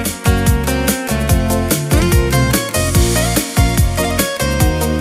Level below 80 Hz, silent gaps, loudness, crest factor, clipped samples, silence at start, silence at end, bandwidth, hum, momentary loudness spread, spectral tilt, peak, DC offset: -20 dBFS; none; -15 LUFS; 14 dB; under 0.1%; 0 s; 0 s; 16.5 kHz; none; 3 LU; -4.5 dB/octave; 0 dBFS; under 0.1%